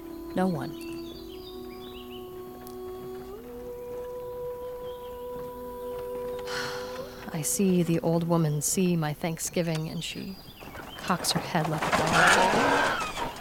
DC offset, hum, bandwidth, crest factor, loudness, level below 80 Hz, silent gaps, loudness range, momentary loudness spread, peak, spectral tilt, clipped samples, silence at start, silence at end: under 0.1%; none; 18 kHz; 22 dB; -28 LUFS; -52 dBFS; none; 14 LU; 18 LU; -8 dBFS; -4 dB/octave; under 0.1%; 0 s; 0 s